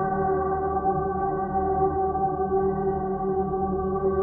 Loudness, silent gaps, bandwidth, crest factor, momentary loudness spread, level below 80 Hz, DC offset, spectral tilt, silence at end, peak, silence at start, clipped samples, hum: -25 LUFS; none; 2.1 kHz; 12 dB; 3 LU; -42 dBFS; under 0.1%; -13.5 dB/octave; 0 s; -12 dBFS; 0 s; under 0.1%; none